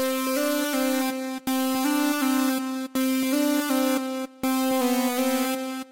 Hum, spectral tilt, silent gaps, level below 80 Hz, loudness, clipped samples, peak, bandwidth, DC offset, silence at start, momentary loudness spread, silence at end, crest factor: none; -2 dB/octave; none; -68 dBFS; -25 LUFS; under 0.1%; -14 dBFS; 16 kHz; under 0.1%; 0 s; 5 LU; 0.05 s; 10 dB